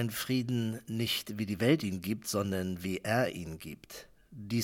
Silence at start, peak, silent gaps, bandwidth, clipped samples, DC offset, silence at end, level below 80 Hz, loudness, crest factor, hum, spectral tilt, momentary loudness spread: 0 s; -14 dBFS; none; 18 kHz; under 0.1%; under 0.1%; 0 s; -66 dBFS; -33 LUFS; 20 dB; none; -5 dB/octave; 18 LU